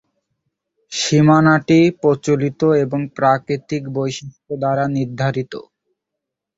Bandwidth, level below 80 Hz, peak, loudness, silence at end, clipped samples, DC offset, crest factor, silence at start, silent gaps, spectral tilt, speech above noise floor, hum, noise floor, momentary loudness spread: 8 kHz; -56 dBFS; -2 dBFS; -17 LUFS; 0.95 s; under 0.1%; under 0.1%; 16 dB; 0.9 s; none; -6 dB/octave; 65 dB; none; -81 dBFS; 13 LU